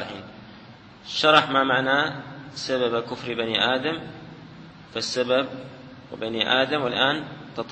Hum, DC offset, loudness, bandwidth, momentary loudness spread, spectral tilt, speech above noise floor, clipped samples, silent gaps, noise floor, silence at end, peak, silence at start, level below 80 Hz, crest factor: none; under 0.1%; -23 LUFS; 8.8 kHz; 23 LU; -4 dB/octave; 23 dB; under 0.1%; none; -46 dBFS; 0 s; -2 dBFS; 0 s; -62 dBFS; 24 dB